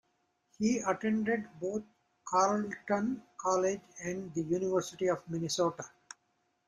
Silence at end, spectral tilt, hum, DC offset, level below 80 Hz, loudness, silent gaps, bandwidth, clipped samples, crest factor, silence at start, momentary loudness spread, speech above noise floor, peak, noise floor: 0.8 s; -5 dB/octave; none; under 0.1%; -72 dBFS; -33 LUFS; none; 14 kHz; under 0.1%; 20 dB; 0.6 s; 12 LU; 45 dB; -14 dBFS; -77 dBFS